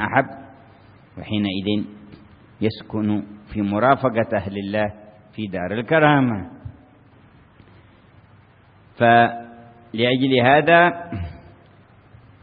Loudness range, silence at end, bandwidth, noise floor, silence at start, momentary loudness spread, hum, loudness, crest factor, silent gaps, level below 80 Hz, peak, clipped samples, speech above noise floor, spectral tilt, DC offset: 7 LU; 1.05 s; 5 kHz; -51 dBFS; 0 s; 21 LU; none; -19 LUFS; 22 dB; none; -52 dBFS; 0 dBFS; under 0.1%; 33 dB; -11 dB/octave; under 0.1%